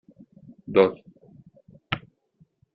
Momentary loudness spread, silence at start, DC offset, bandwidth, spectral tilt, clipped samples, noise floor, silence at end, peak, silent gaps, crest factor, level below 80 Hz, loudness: 25 LU; 0.7 s; under 0.1%; 5.8 kHz; -4 dB/octave; under 0.1%; -63 dBFS; 0.75 s; -4 dBFS; none; 24 dB; -62 dBFS; -24 LUFS